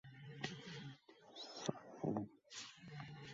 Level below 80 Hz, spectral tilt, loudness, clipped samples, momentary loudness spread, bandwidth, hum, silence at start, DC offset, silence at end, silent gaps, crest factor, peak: -80 dBFS; -4.5 dB/octave; -49 LUFS; under 0.1%; 13 LU; 7.6 kHz; none; 0.05 s; under 0.1%; 0 s; none; 26 dB; -24 dBFS